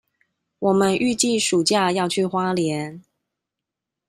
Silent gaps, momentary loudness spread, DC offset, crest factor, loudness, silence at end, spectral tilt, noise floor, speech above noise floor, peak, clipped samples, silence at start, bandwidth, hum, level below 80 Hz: none; 7 LU; under 0.1%; 16 dB; -20 LUFS; 1.1 s; -4 dB/octave; -85 dBFS; 65 dB; -6 dBFS; under 0.1%; 0.6 s; 15 kHz; none; -62 dBFS